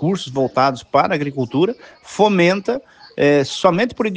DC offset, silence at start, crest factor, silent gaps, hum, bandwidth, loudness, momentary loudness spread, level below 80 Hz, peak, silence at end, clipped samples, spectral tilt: under 0.1%; 0 s; 16 dB; none; none; 9.6 kHz; -17 LUFS; 10 LU; -56 dBFS; 0 dBFS; 0 s; under 0.1%; -6 dB/octave